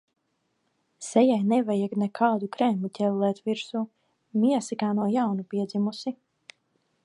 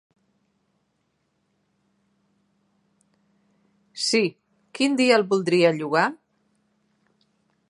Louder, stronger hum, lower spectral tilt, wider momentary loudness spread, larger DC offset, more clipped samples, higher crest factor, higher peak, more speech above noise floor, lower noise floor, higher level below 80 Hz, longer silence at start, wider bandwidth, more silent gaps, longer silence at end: second, -26 LUFS vs -21 LUFS; neither; first, -6.5 dB/octave vs -4 dB/octave; about the same, 11 LU vs 9 LU; neither; neither; second, 18 dB vs 24 dB; second, -8 dBFS vs -2 dBFS; about the same, 50 dB vs 52 dB; about the same, -75 dBFS vs -72 dBFS; about the same, -80 dBFS vs -80 dBFS; second, 1 s vs 3.95 s; about the same, 11 kHz vs 11.5 kHz; neither; second, 0.9 s vs 1.55 s